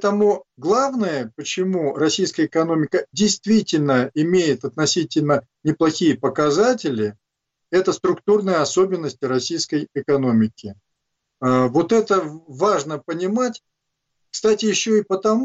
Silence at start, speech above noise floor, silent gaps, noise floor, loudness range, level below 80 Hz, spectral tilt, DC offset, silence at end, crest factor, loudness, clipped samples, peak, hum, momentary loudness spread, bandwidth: 0 s; 59 dB; none; -79 dBFS; 2 LU; -62 dBFS; -5 dB/octave; under 0.1%; 0 s; 12 dB; -20 LUFS; under 0.1%; -8 dBFS; none; 7 LU; 8 kHz